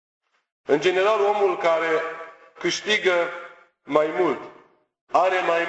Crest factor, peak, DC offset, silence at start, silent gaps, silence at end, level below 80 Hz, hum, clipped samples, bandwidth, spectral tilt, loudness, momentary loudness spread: 20 dB; -4 dBFS; under 0.1%; 0.7 s; 5.01-5.07 s; 0 s; -70 dBFS; none; under 0.1%; 8.2 kHz; -3.5 dB/octave; -22 LUFS; 13 LU